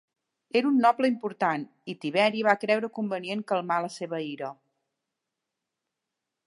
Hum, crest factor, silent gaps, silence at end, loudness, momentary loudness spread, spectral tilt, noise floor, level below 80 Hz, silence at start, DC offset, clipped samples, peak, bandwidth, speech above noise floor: none; 22 dB; none; 1.95 s; -27 LUFS; 13 LU; -5.5 dB/octave; -86 dBFS; -84 dBFS; 0.55 s; under 0.1%; under 0.1%; -6 dBFS; 11.5 kHz; 59 dB